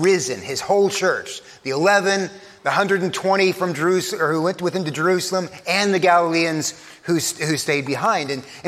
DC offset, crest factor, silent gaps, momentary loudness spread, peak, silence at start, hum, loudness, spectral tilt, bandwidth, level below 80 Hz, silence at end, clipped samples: under 0.1%; 18 dB; none; 10 LU; -2 dBFS; 0 s; none; -20 LUFS; -4 dB/octave; 15.5 kHz; -66 dBFS; 0 s; under 0.1%